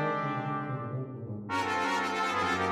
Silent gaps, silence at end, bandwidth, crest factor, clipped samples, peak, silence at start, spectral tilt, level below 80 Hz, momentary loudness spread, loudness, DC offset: none; 0 s; 14.5 kHz; 14 dB; under 0.1%; -18 dBFS; 0 s; -5 dB/octave; -68 dBFS; 9 LU; -31 LUFS; under 0.1%